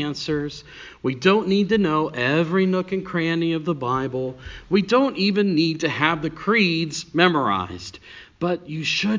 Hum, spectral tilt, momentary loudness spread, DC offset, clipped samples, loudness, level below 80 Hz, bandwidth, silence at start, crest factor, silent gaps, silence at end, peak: none; -5.5 dB/octave; 11 LU; under 0.1%; under 0.1%; -21 LUFS; -52 dBFS; 7.6 kHz; 0 s; 20 dB; none; 0 s; -2 dBFS